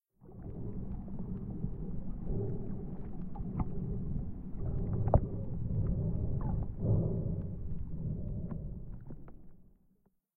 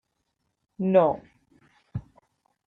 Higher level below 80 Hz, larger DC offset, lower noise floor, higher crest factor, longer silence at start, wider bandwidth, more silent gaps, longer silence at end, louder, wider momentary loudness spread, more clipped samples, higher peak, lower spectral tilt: first, -42 dBFS vs -60 dBFS; neither; second, -71 dBFS vs -77 dBFS; about the same, 24 dB vs 22 dB; second, 0.2 s vs 0.8 s; second, 2.3 kHz vs 4 kHz; neither; about the same, 0.75 s vs 0.65 s; second, -38 LUFS vs -24 LUFS; second, 13 LU vs 18 LU; neither; second, -12 dBFS vs -6 dBFS; first, -14 dB/octave vs -10 dB/octave